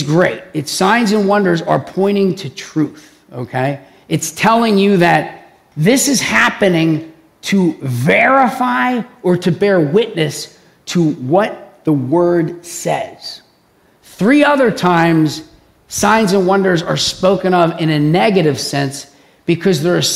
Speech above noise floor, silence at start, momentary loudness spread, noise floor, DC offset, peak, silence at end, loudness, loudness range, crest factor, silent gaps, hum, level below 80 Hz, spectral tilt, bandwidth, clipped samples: 39 dB; 0 s; 12 LU; -53 dBFS; under 0.1%; 0 dBFS; 0 s; -14 LUFS; 4 LU; 14 dB; none; none; -52 dBFS; -5 dB/octave; 16 kHz; under 0.1%